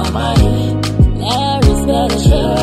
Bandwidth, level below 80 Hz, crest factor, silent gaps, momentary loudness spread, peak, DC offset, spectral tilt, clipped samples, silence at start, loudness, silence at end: 13.5 kHz; -18 dBFS; 12 dB; none; 3 LU; 0 dBFS; under 0.1%; -6 dB/octave; under 0.1%; 0 s; -13 LUFS; 0 s